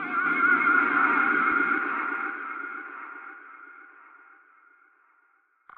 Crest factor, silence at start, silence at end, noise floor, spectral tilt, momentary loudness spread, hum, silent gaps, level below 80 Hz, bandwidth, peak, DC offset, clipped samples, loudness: 18 dB; 0 s; 1.9 s; -66 dBFS; -1.5 dB/octave; 22 LU; none; none; -80 dBFS; 4.3 kHz; -10 dBFS; under 0.1%; under 0.1%; -23 LUFS